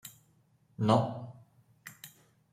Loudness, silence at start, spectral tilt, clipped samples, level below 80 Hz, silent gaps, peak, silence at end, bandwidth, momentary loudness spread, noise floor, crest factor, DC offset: -30 LUFS; 0.05 s; -7 dB/octave; under 0.1%; -70 dBFS; none; -10 dBFS; 0.45 s; 16 kHz; 24 LU; -68 dBFS; 26 dB; under 0.1%